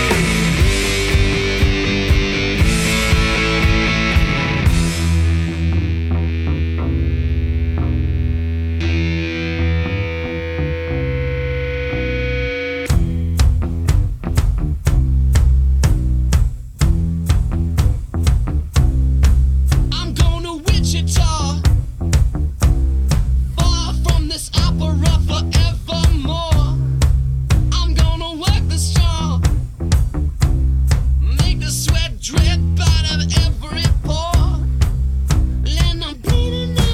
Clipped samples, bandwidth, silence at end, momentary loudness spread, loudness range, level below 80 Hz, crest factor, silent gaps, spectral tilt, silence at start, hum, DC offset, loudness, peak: under 0.1%; 15 kHz; 0 s; 5 LU; 4 LU; -18 dBFS; 12 dB; none; -5 dB/octave; 0 s; none; under 0.1%; -17 LUFS; -4 dBFS